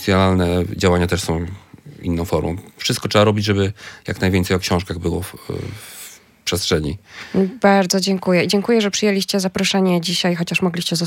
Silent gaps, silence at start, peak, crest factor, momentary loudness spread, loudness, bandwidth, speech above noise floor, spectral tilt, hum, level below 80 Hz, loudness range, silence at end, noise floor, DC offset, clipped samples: none; 0 s; -2 dBFS; 18 dB; 13 LU; -18 LUFS; 17 kHz; 22 dB; -5 dB/octave; none; -46 dBFS; 5 LU; 0 s; -40 dBFS; under 0.1%; under 0.1%